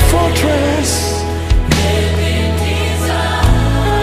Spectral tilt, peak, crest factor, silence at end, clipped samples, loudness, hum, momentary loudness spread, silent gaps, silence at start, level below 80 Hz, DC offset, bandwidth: -5 dB/octave; 0 dBFS; 12 dB; 0 s; under 0.1%; -14 LUFS; none; 3 LU; none; 0 s; -18 dBFS; under 0.1%; 15.5 kHz